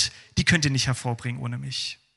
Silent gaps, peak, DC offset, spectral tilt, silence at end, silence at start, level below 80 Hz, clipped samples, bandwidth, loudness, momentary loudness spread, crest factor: none; -6 dBFS; under 0.1%; -3.5 dB/octave; 0.25 s; 0 s; -48 dBFS; under 0.1%; 12 kHz; -25 LUFS; 10 LU; 20 dB